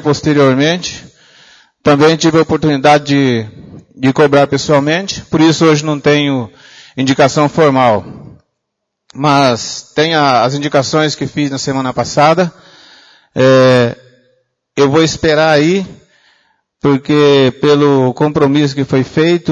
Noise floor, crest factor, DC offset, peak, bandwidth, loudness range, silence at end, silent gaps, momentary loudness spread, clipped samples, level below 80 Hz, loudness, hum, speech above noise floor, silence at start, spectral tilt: -73 dBFS; 12 dB; under 0.1%; 0 dBFS; 9.6 kHz; 2 LU; 0 s; none; 9 LU; under 0.1%; -46 dBFS; -11 LUFS; none; 63 dB; 0 s; -5.5 dB/octave